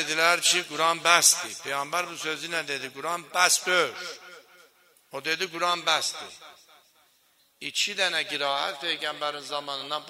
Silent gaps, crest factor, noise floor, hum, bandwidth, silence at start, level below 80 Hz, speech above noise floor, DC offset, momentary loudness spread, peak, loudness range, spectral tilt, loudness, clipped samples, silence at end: none; 26 dB; -65 dBFS; none; 16 kHz; 0 s; -82 dBFS; 38 dB; under 0.1%; 13 LU; -2 dBFS; 7 LU; 0 dB/octave; -25 LUFS; under 0.1%; 0 s